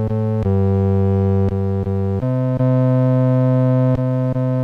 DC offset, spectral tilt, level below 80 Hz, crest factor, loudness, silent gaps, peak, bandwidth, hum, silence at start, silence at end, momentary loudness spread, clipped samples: under 0.1%; -11.5 dB/octave; -42 dBFS; 8 dB; -17 LUFS; none; -8 dBFS; 3.9 kHz; none; 0 s; 0 s; 5 LU; under 0.1%